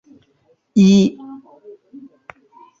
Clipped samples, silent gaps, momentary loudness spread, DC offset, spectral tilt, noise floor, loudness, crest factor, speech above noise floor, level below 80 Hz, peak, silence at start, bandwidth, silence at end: under 0.1%; none; 26 LU; under 0.1%; -7 dB/octave; -60 dBFS; -14 LUFS; 16 dB; 45 dB; -58 dBFS; -4 dBFS; 0.75 s; 7.6 kHz; 1.45 s